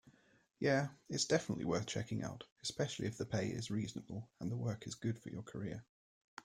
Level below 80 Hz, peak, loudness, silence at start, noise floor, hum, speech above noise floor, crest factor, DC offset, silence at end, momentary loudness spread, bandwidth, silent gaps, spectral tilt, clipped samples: -70 dBFS; -20 dBFS; -40 LUFS; 0.05 s; -68 dBFS; none; 28 dB; 22 dB; under 0.1%; 0.05 s; 12 LU; 14 kHz; 2.52-2.56 s, 5.89-6.37 s; -5 dB/octave; under 0.1%